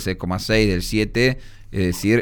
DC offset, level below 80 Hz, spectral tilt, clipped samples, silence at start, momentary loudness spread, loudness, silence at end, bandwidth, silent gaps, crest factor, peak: under 0.1%; -34 dBFS; -5.5 dB/octave; under 0.1%; 0 s; 8 LU; -20 LUFS; 0 s; over 20 kHz; none; 16 dB; -4 dBFS